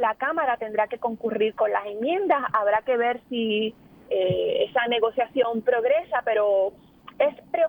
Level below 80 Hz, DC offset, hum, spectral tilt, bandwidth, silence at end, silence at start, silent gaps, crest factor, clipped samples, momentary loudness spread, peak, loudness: -64 dBFS; under 0.1%; none; -7 dB/octave; 19.5 kHz; 0 s; 0 s; none; 16 dB; under 0.1%; 5 LU; -8 dBFS; -24 LUFS